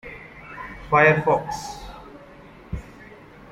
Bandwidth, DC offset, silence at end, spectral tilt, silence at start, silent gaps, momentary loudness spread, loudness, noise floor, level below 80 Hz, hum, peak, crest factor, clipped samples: 15.5 kHz; under 0.1%; 0.4 s; -6 dB/octave; 0.05 s; none; 25 LU; -19 LUFS; -45 dBFS; -46 dBFS; none; -4 dBFS; 22 dB; under 0.1%